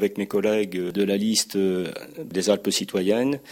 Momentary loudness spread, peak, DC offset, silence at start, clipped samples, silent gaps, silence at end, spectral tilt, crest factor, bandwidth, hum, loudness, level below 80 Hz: 7 LU; -6 dBFS; under 0.1%; 0 s; under 0.1%; none; 0 s; -4 dB/octave; 18 dB; 17 kHz; none; -24 LUFS; -66 dBFS